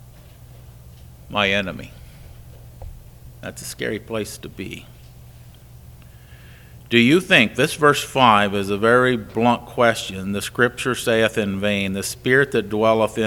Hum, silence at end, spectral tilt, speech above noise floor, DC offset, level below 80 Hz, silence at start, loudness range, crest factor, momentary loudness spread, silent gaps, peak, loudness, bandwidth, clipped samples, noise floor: none; 0 s; -4.5 dB/octave; 24 dB; under 0.1%; -46 dBFS; 0.65 s; 15 LU; 22 dB; 18 LU; none; 0 dBFS; -19 LUFS; 19 kHz; under 0.1%; -43 dBFS